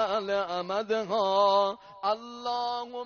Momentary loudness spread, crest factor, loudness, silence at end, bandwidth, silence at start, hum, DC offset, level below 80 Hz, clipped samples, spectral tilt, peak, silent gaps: 9 LU; 16 dB; -28 LUFS; 0 s; 6.8 kHz; 0 s; none; under 0.1%; -70 dBFS; under 0.1%; -1.5 dB/octave; -12 dBFS; none